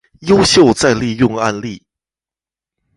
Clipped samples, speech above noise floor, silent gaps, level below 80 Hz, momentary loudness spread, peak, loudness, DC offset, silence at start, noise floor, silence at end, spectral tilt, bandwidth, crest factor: under 0.1%; over 78 dB; none; -42 dBFS; 12 LU; 0 dBFS; -12 LUFS; under 0.1%; 0.2 s; under -90 dBFS; 1.2 s; -4.5 dB/octave; 11.5 kHz; 14 dB